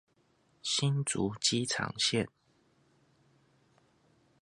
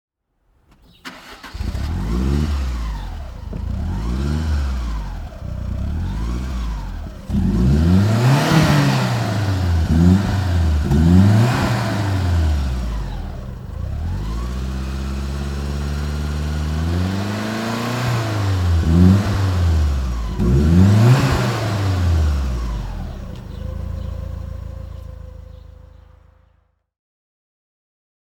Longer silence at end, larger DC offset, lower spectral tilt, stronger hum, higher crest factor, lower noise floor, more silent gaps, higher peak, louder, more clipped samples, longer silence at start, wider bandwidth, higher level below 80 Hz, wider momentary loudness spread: second, 2.15 s vs 2.4 s; neither; second, -3.5 dB/octave vs -7 dB/octave; neither; about the same, 22 dB vs 18 dB; first, -71 dBFS vs -63 dBFS; neither; second, -14 dBFS vs -2 dBFS; second, -31 LUFS vs -19 LUFS; neither; second, 0.65 s vs 1.05 s; second, 11.5 kHz vs 16 kHz; second, -68 dBFS vs -26 dBFS; second, 6 LU vs 18 LU